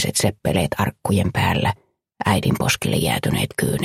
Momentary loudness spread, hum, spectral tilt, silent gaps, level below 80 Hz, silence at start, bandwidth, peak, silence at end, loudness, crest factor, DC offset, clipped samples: 4 LU; none; -4.5 dB/octave; none; -42 dBFS; 0 s; 16 kHz; -2 dBFS; 0 s; -20 LUFS; 18 dB; under 0.1%; under 0.1%